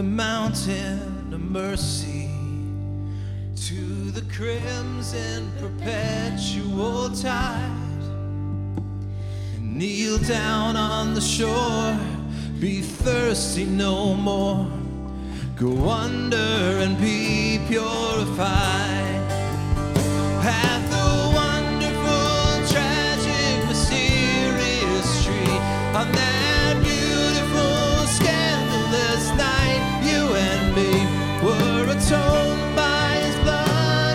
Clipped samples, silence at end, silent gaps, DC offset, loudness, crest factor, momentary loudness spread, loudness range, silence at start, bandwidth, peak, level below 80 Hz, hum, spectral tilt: under 0.1%; 0 s; none; under 0.1%; -22 LUFS; 18 dB; 10 LU; 8 LU; 0 s; 16 kHz; -4 dBFS; -34 dBFS; none; -4.5 dB/octave